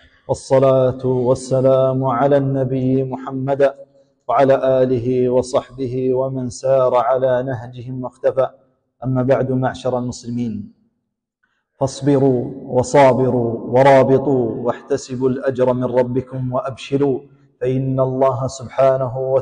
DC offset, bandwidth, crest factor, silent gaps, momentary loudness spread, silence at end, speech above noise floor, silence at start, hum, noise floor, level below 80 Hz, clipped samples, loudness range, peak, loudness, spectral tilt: under 0.1%; 9.8 kHz; 14 dB; none; 11 LU; 0 s; 58 dB; 0.3 s; none; -75 dBFS; -50 dBFS; under 0.1%; 6 LU; -4 dBFS; -17 LUFS; -7.5 dB/octave